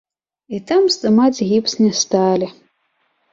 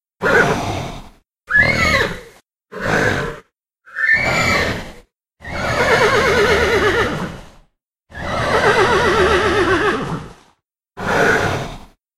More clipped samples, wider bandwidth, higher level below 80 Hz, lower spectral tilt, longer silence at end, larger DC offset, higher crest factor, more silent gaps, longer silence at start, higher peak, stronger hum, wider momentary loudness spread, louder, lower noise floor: neither; second, 7.8 kHz vs 15.5 kHz; second, -60 dBFS vs -36 dBFS; about the same, -4.5 dB/octave vs -4.5 dB/octave; first, 0.8 s vs 0.4 s; neither; about the same, 14 dB vs 18 dB; neither; first, 0.5 s vs 0.2 s; second, -4 dBFS vs 0 dBFS; neither; second, 12 LU vs 16 LU; about the same, -16 LUFS vs -16 LUFS; first, -66 dBFS vs -60 dBFS